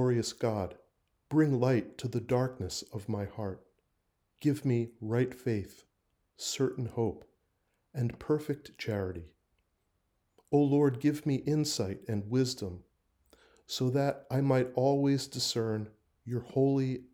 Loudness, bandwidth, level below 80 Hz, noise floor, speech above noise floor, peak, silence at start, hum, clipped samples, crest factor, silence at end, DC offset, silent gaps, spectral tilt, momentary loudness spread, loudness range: -32 LUFS; 16.5 kHz; -66 dBFS; -78 dBFS; 47 dB; -14 dBFS; 0 s; none; under 0.1%; 18 dB; 0.1 s; under 0.1%; none; -6 dB/octave; 12 LU; 5 LU